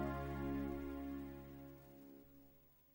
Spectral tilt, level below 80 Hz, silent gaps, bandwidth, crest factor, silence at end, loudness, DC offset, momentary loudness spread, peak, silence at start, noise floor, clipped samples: -8 dB/octave; -56 dBFS; none; 16.5 kHz; 16 dB; 0 s; -47 LUFS; under 0.1%; 21 LU; -32 dBFS; 0 s; -68 dBFS; under 0.1%